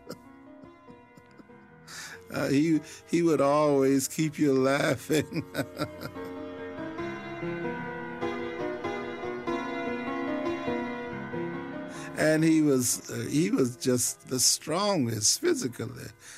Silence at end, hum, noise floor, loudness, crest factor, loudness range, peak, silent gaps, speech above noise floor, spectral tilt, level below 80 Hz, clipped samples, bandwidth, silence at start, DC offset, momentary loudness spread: 0 s; none; -53 dBFS; -28 LUFS; 18 dB; 9 LU; -10 dBFS; none; 26 dB; -4 dB/octave; -64 dBFS; under 0.1%; 16 kHz; 0.05 s; under 0.1%; 15 LU